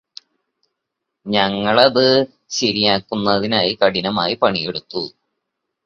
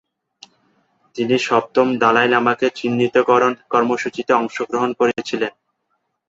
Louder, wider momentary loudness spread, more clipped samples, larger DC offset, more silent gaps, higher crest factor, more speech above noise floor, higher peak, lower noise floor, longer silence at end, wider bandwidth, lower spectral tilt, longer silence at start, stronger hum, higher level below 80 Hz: about the same, -17 LUFS vs -18 LUFS; first, 11 LU vs 8 LU; neither; neither; neither; about the same, 18 dB vs 18 dB; first, 62 dB vs 54 dB; about the same, 0 dBFS vs -2 dBFS; first, -79 dBFS vs -71 dBFS; about the same, 0.75 s vs 0.8 s; about the same, 7.6 kHz vs 7.8 kHz; about the same, -4 dB/octave vs -5 dB/octave; about the same, 1.25 s vs 1.15 s; neither; first, -54 dBFS vs -64 dBFS